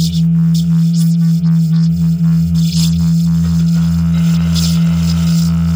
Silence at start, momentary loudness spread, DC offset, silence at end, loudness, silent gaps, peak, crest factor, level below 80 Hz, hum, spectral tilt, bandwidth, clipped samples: 0 s; 1 LU; under 0.1%; 0 s; -12 LUFS; none; -4 dBFS; 8 dB; -30 dBFS; none; -6.5 dB/octave; 16 kHz; under 0.1%